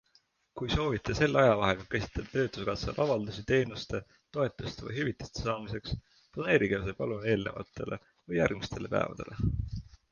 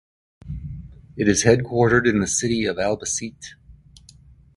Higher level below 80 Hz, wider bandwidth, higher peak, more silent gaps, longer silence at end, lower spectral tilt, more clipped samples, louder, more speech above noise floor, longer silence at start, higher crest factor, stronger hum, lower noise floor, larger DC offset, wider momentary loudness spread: about the same, -48 dBFS vs -44 dBFS; second, 7.2 kHz vs 11.5 kHz; second, -10 dBFS vs 0 dBFS; neither; second, 0.25 s vs 0.85 s; first, -6 dB/octave vs -4.5 dB/octave; neither; second, -32 LUFS vs -20 LUFS; first, 38 dB vs 30 dB; about the same, 0.55 s vs 0.45 s; about the same, 22 dB vs 22 dB; neither; first, -69 dBFS vs -50 dBFS; neither; second, 13 LU vs 22 LU